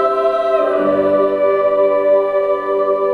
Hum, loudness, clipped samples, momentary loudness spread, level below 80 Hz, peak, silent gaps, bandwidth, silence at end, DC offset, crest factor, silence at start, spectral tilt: none; -15 LUFS; under 0.1%; 3 LU; -54 dBFS; -4 dBFS; none; 4.9 kHz; 0 s; under 0.1%; 10 dB; 0 s; -7 dB/octave